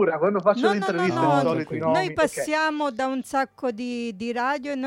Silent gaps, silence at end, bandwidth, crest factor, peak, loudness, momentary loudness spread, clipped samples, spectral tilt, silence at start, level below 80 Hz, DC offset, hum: none; 0 s; 16.5 kHz; 16 dB; -8 dBFS; -24 LUFS; 8 LU; under 0.1%; -5.5 dB/octave; 0 s; -62 dBFS; under 0.1%; none